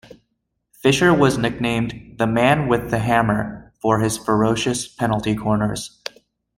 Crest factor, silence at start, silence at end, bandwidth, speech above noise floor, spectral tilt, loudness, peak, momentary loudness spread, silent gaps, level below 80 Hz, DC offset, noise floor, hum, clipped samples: 18 dB; 0.85 s; 0.7 s; 16.5 kHz; 55 dB; -5.5 dB/octave; -19 LUFS; -2 dBFS; 11 LU; none; -46 dBFS; under 0.1%; -74 dBFS; none; under 0.1%